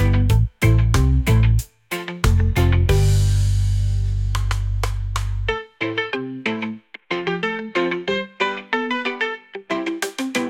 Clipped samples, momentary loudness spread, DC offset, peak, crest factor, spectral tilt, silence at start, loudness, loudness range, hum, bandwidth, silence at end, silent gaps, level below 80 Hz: under 0.1%; 9 LU; under 0.1%; -4 dBFS; 14 dB; -6 dB/octave; 0 s; -21 LUFS; 6 LU; none; 17 kHz; 0 s; none; -24 dBFS